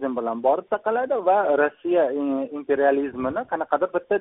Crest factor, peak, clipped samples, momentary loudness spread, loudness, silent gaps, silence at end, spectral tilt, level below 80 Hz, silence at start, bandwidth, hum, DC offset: 18 dB; -6 dBFS; under 0.1%; 6 LU; -23 LUFS; none; 0 s; 0.5 dB/octave; -64 dBFS; 0 s; 3.9 kHz; none; under 0.1%